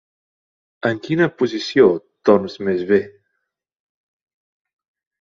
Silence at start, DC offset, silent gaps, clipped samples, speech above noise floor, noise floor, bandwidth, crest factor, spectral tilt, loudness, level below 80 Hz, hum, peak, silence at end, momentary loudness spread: 0.85 s; under 0.1%; none; under 0.1%; 58 dB; -75 dBFS; 7.2 kHz; 20 dB; -6.5 dB/octave; -18 LUFS; -60 dBFS; none; -2 dBFS; 2.1 s; 8 LU